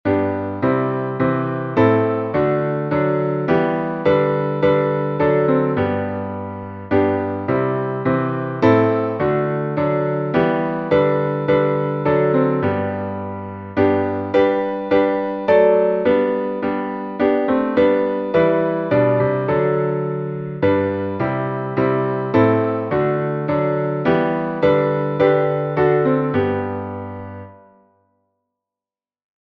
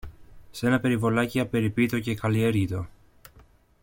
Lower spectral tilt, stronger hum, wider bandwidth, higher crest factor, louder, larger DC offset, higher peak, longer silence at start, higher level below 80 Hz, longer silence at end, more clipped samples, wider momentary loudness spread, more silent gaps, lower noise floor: first, -10 dB/octave vs -7 dB/octave; neither; second, 6 kHz vs 17 kHz; about the same, 16 dB vs 16 dB; first, -18 LUFS vs -25 LUFS; neither; first, -2 dBFS vs -10 dBFS; about the same, 0.05 s vs 0.05 s; about the same, -52 dBFS vs -52 dBFS; first, 2 s vs 0.95 s; neither; about the same, 7 LU vs 9 LU; neither; first, under -90 dBFS vs -56 dBFS